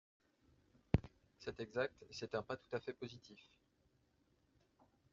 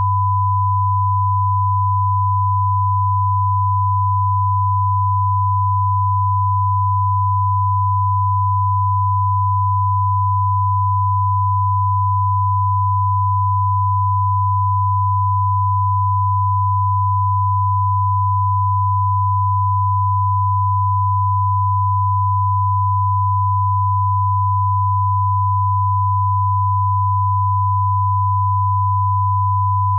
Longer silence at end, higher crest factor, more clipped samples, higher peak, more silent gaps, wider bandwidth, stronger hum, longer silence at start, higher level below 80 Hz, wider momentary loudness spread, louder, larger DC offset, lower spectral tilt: first, 1.7 s vs 0 s; first, 30 dB vs 6 dB; neither; second, -16 dBFS vs -10 dBFS; neither; first, 7.4 kHz vs 1.1 kHz; neither; first, 0.95 s vs 0 s; second, -62 dBFS vs -52 dBFS; first, 20 LU vs 0 LU; second, -45 LUFS vs -17 LUFS; neither; second, -5.5 dB/octave vs -15 dB/octave